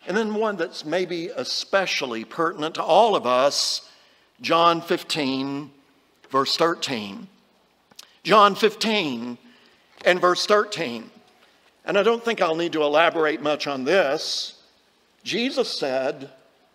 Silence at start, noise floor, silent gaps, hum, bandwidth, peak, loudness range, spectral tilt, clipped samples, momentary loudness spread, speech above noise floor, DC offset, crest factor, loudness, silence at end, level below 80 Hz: 0.05 s; -62 dBFS; none; none; 16 kHz; -2 dBFS; 3 LU; -3.5 dB/octave; under 0.1%; 12 LU; 40 dB; under 0.1%; 20 dB; -22 LUFS; 0.45 s; -78 dBFS